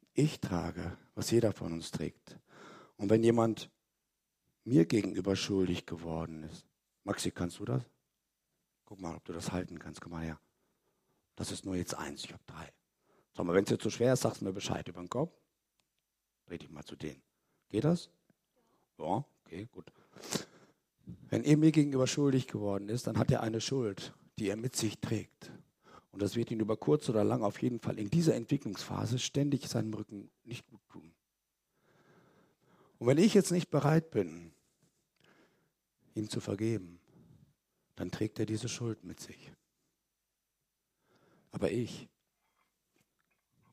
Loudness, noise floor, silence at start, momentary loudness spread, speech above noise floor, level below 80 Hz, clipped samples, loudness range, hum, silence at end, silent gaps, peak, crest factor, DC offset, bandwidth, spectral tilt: -33 LUFS; -86 dBFS; 0.15 s; 20 LU; 53 dB; -66 dBFS; under 0.1%; 11 LU; none; 1.7 s; none; -12 dBFS; 22 dB; under 0.1%; 15.5 kHz; -6 dB/octave